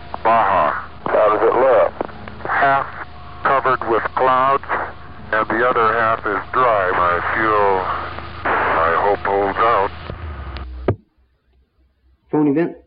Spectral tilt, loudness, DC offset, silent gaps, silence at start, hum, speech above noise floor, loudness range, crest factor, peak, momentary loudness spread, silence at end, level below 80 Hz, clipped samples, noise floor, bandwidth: -10.5 dB/octave; -17 LUFS; 1%; none; 0 s; none; 42 dB; 3 LU; 14 dB; -4 dBFS; 15 LU; 0 s; -40 dBFS; under 0.1%; -59 dBFS; 5.4 kHz